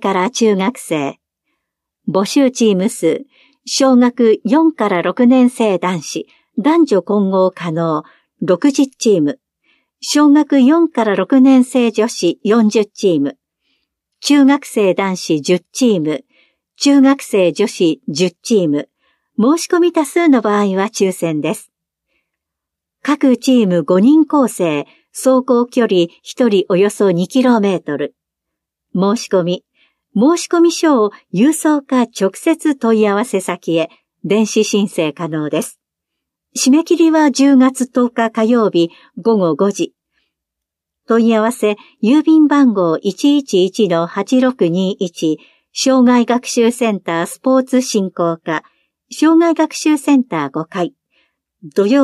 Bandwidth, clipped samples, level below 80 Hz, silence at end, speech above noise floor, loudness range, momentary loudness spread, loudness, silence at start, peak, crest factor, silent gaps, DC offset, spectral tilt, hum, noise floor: 13.5 kHz; under 0.1%; -70 dBFS; 0 s; 68 dB; 4 LU; 11 LU; -14 LUFS; 0 s; -2 dBFS; 12 dB; none; under 0.1%; -5 dB/octave; none; -81 dBFS